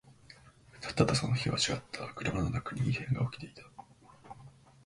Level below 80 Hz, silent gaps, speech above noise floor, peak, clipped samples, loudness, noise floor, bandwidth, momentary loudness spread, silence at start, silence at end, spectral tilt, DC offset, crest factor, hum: -54 dBFS; none; 25 dB; -10 dBFS; under 0.1%; -33 LUFS; -57 dBFS; 11.5 kHz; 23 LU; 0.3 s; 0.35 s; -5 dB/octave; under 0.1%; 24 dB; none